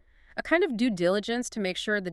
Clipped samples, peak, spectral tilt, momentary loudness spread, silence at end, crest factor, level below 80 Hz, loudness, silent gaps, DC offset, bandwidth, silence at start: under 0.1%; -10 dBFS; -4.5 dB/octave; 8 LU; 0 s; 16 dB; -58 dBFS; -27 LUFS; none; under 0.1%; 12.5 kHz; 0.35 s